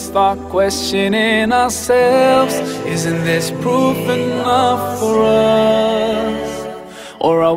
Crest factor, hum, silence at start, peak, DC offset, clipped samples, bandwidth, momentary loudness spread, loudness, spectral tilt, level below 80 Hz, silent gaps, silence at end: 14 dB; none; 0 s; -2 dBFS; under 0.1%; under 0.1%; 16 kHz; 8 LU; -15 LUFS; -4.5 dB/octave; -44 dBFS; none; 0 s